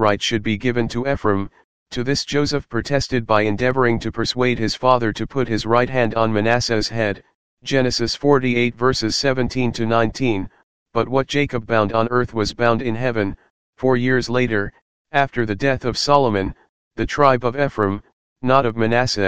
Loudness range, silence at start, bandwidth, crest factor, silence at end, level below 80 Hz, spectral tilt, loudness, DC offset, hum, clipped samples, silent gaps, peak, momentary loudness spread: 2 LU; 0 s; 9.8 kHz; 18 dB; 0 s; -42 dBFS; -5.5 dB/octave; -19 LUFS; 2%; none; under 0.1%; 1.64-1.86 s, 7.35-7.57 s, 10.63-10.86 s, 13.50-13.73 s, 14.82-15.05 s, 16.69-16.91 s, 18.13-18.36 s; 0 dBFS; 7 LU